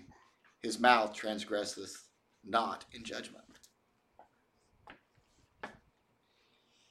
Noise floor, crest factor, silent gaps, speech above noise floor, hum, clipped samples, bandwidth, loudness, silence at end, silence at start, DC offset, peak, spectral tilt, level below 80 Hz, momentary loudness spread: -75 dBFS; 30 dB; none; 41 dB; none; under 0.1%; 14.5 kHz; -34 LUFS; 1.2 s; 0.1 s; under 0.1%; -8 dBFS; -2.5 dB/octave; -74 dBFS; 23 LU